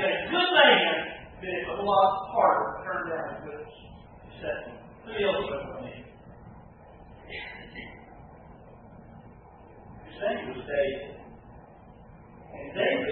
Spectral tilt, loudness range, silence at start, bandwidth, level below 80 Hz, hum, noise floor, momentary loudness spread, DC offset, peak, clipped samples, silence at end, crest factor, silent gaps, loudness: -8 dB/octave; 20 LU; 0 s; 4.3 kHz; -56 dBFS; none; -50 dBFS; 26 LU; under 0.1%; -6 dBFS; under 0.1%; 0 s; 24 dB; none; -27 LUFS